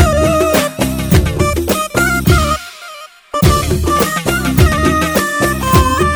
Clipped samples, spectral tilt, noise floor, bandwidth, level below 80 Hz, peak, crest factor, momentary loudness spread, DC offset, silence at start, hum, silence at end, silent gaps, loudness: under 0.1%; -5 dB/octave; -33 dBFS; over 20 kHz; -22 dBFS; 0 dBFS; 12 dB; 7 LU; under 0.1%; 0 s; none; 0 s; none; -13 LUFS